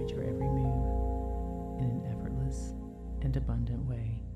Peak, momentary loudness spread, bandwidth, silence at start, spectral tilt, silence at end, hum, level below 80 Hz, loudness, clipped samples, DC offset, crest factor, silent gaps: -20 dBFS; 7 LU; 9.2 kHz; 0 s; -9 dB/octave; 0 s; none; -36 dBFS; -35 LUFS; under 0.1%; under 0.1%; 12 dB; none